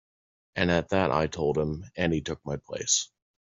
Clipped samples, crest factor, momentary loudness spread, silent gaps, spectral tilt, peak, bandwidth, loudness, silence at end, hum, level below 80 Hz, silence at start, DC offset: under 0.1%; 20 dB; 10 LU; none; -4 dB/octave; -8 dBFS; 8 kHz; -28 LUFS; 0.45 s; none; -52 dBFS; 0.55 s; under 0.1%